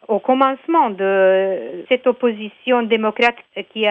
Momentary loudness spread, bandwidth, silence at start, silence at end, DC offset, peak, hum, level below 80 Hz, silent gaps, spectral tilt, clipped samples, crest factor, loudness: 9 LU; 7.6 kHz; 0.1 s; 0 s; under 0.1%; -2 dBFS; none; -66 dBFS; none; -6 dB/octave; under 0.1%; 16 dB; -17 LUFS